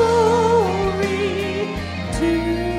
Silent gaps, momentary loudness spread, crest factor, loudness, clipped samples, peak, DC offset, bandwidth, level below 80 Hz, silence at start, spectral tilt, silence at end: none; 9 LU; 14 dB; -20 LUFS; under 0.1%; -6 dBFS; under 0.1%; 14.5 kHz; -36 dBFS; 0 s; -6 dB/octave; 0 s